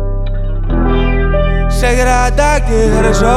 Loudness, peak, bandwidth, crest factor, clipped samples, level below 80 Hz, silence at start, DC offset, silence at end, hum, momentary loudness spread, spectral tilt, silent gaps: -13 LUFS; -2 dBFS; 12.5 kHz; 10 dB; under 0.1%; -14 dBFS; 0 s; under 0.1%; 0 s; none; 9 LU; -5.5 dB/octave; none